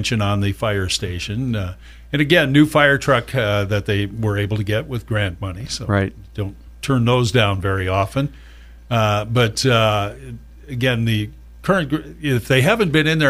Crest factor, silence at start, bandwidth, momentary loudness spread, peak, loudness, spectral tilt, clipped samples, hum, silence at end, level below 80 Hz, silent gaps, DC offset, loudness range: 18 dB; 0 s; 15.5 kHz; 14 LU; 0 dBFS; -19 LUFS; -5.5 dB/octave; under 0.1%; none; 0 s; -40 dBFS; none; under 0.1%; 4 LU